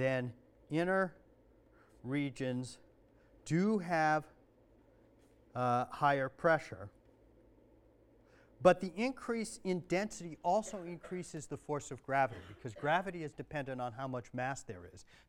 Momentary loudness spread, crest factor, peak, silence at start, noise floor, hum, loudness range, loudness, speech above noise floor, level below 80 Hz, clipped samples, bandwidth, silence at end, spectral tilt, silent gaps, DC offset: 16 LU; 26 dB; -12 dBFS; 0 s; -66 dBFS; none; 3 LU; -36 LUFS; 30 dB; -68 dBFS; under 0.1%; 14 kHz; 0.25 s; -6 dB/octave; none; under 0.1%